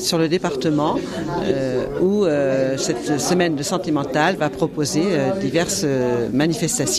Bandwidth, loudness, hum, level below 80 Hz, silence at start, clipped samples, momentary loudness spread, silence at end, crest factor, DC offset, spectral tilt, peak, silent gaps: 15 kHz; -20 LUFS; none; -48 dBFS; 0 s; under 0.1%; 4 LU; 0 s; 16 dB; under 0.1%; -4.5 dB/octave; -2 dBFS; none